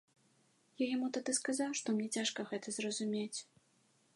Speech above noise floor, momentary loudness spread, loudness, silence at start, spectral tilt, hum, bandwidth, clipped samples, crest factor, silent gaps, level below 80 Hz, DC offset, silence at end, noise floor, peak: 36 dB; 6 LU; -38 LUFS; 0.8 s; -3 dB/octave; none; 11.5 kHz; under 0.1%; 18 dB; none; under -90 dBFS; under 0.1%; 0.7 s; -73 dBFS; -22 dBFS